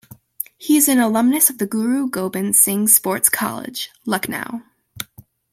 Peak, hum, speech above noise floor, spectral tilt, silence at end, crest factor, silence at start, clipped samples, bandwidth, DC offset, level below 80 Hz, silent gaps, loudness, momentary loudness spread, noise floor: 0 dBFS; none; 29 dB; -3 dB/octave; 0.5 s; 20 dB; 0.6 s; under 0.1%; 16.5 kHz; under 0.1%; -62 dBFS; none; -16 LUFS; 18 LU; -47 dBFS